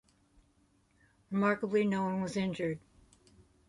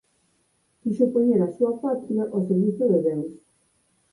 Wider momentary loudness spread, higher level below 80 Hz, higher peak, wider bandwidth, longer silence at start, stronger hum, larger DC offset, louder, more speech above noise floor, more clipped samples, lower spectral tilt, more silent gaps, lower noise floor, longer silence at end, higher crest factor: about the same, 8 LU vs 10 LU; about the same, -68 dBFS vs -68 dBFS; second, -16 dBFS vs -8 dBFS; about the same, 11.5 kHz vs 11 kHz; first, 1.3 s vs 0.85 s; neither; neither; second, -33 LUFS vs -23 LUFS; second, 38 dB vs 46 dB; neither; second, -7 dB/octave vs -11 dB/octave; neither; about the same, -70 dBFS vs -68 dBFS; first, 0.9 s vs 0.75 s; about the same, 18 dB vs 16 dB